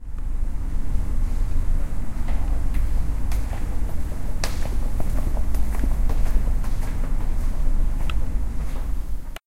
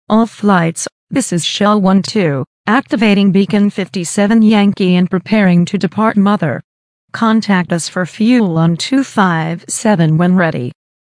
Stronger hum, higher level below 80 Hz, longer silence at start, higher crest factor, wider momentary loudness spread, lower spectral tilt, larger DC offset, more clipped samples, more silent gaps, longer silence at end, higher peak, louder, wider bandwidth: neither; first, -22 dBFS vs -52 dBFS; about the same, 0 s vs 0.1 s; about the same, 14 dB vs 12 dB; second, 5 LU vs 8 LU; about the same, -6 dB/octave vs -5.5 dB/octave; neither; neither; second, none vs 0.92-1.07 s, 2.47-2.64 s, 6.64-7.08 s; second, 0.1 s vs 0.45 s; second, -6 dBFS vs 0 dBFS; second, -29 LUFS vs -13 LUFS; first, 13 kHz vs 10.5 kHz